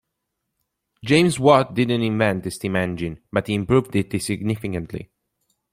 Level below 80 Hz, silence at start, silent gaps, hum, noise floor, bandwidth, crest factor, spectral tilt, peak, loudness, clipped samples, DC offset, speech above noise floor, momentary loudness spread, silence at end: -52 dBFS; 1.05 s; none; none; -79 dBFS; 16 kHz; 20 dB; -6 dB/octave; -2 dBFS; -21 LUFS; under 0.1%; under 0.1%; 58 dB; 13 LU; 0.7 s